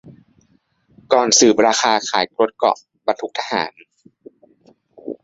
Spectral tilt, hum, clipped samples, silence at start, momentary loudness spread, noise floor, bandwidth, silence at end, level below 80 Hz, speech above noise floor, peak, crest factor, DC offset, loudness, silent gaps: -1.5 dB/octave; none; under 0.1%; 0.05 s; 12 LU; -60 dBFS; 8 kHz; 0.1 s; -64 dBFS; 43 dB; 0 dBFS; 20 dB; under 0.1%; -17 LUFS; none